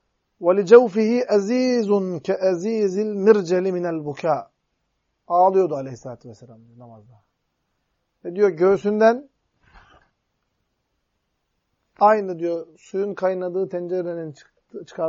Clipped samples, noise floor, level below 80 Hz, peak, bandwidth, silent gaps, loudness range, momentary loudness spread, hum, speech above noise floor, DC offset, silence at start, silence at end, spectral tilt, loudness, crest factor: under 0.1%; -74 dBFS; -68 dBFS; -2 dBFS; 7.6 kHz; none; 7 LU; 16 LU; none; 54 dB; under 0.1%; 0.4 s; 0 s; -6.5 dB/octave; -20 LUFS; 20 dB